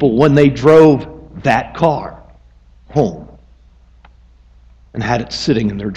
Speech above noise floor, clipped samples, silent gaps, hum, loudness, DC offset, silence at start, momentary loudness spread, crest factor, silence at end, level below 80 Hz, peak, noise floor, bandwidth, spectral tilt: 33 dB; under 0.1%; none; none; -13 LUFS; under 0.1%; 0 s; 18 LU; 16 dB; 0 s; -40 dBFS; 0 dBFS; -46 dBFS; 8.4 kHz; -7 dB/octave